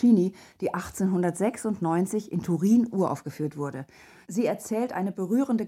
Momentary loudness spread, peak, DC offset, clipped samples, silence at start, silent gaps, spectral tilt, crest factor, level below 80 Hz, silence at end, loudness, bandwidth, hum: 11 LU; -10 dBFS; under 0.1%; under 0.1%; 0 s; none; -7 dB/octave; 16 dB; -62 dBFS; 0 s; -27 LUFS; 15 kHz; none